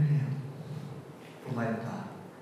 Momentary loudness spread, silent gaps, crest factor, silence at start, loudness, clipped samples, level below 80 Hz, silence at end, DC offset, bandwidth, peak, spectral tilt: 15 LU; none; 14 dB; 0 s; -36 LUFS; under 0.1%; -78 dBFS; 0 s; under 0.1%; 12 kHz; -18 dBFS; -8.5 dB/octave